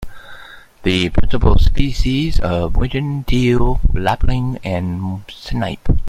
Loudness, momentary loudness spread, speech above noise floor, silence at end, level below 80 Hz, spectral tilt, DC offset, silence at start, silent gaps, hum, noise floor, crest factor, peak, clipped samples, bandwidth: -19 LUFS; 10 LU; 25 dB; 0 s; -18 dBFS; -7 dB/octave; under 0.1%; 0 s; none; none; -38 dBFS; 14 dB; 0 dBFS; under 0.1%; 9.4 kHz